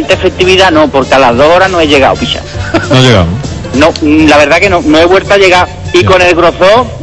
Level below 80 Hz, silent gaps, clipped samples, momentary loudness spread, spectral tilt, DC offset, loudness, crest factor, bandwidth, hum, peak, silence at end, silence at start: -26 dBFS; none; 7%; 8 LU; -5 dB/octave; 1%; -6 LUFS; 6 dB; 11 kHz; none; 0 dBFS; 0 s; 0 s